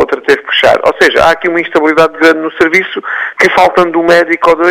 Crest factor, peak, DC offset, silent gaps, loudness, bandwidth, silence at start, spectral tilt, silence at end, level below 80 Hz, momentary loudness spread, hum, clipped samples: 8 dB; 0 dBFS; under 0.1%; none; -8 LUFS; 16 kHz; 0 s; -4 dB/octave; 0 s; -42 dBFS; 4 LU; none; 1%